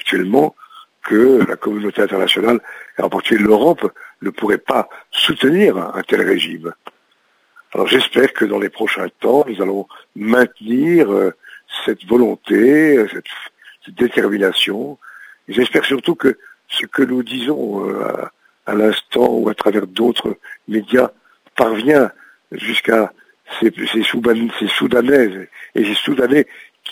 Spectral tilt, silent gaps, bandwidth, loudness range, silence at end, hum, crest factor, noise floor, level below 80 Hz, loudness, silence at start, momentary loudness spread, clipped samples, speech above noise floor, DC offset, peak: -5 dB/octave; none; 16 kHz; 3 LU; 0 s; none; 16 dB; -59 dBFS; -58 dBFS; -16 LUFS; 0.05 s; 14 LU; under 0.1%; 44 dB; under 0.1%; 0 dBFS